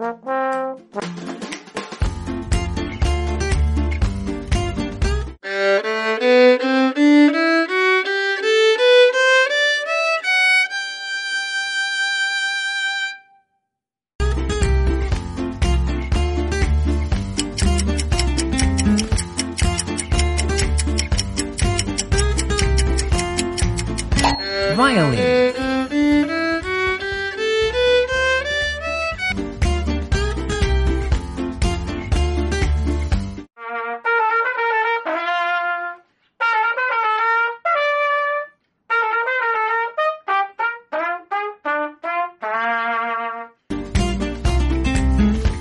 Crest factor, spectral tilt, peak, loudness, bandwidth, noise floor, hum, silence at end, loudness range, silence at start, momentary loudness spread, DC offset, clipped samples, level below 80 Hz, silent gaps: 18 dB; -4.5 dB/octave; -2 dBFS; -19 LUFS; 11.5 kHz; -83 dBFS; none; 0 s; 7 LU; 0 s; 9 LU; under 0.1%; under 0.1%; -26 dBFS; 14.15-14.19 s